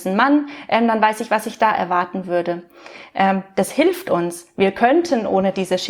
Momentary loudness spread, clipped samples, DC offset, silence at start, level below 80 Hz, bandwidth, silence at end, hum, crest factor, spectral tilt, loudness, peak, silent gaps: 6 LU; under 0.1%; under 0.1%; 0 s; -60 dBFS; over 20 kHz; 0 s; none; 16 dB; -5 dB/octave; -19 LUFS; -2 dBFS; none